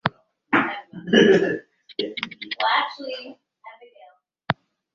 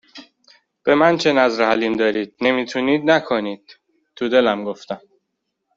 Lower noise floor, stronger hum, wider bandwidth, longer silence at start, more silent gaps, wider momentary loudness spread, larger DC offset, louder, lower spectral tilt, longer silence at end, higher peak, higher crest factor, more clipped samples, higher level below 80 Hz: second, -53 dBFS vs -76 dBFS; neither; about the same, 7.2 kHz vs 7.6 kHz; about the same, 0.05 s vs 0.15 s; neither; first, 17 LU vs 14 LU; neither; second, -22 LUFS vs -18 LUFS; about the same, -5.5 dB/octave vs -5 dB/octave; second, 0.4 s vs 0.8 s; about the same, -2 dBFS vs -2 dBFS; about the same, 22 dB vs 18 dB; neither; about the same, -64 dBFS vs -62 dBFS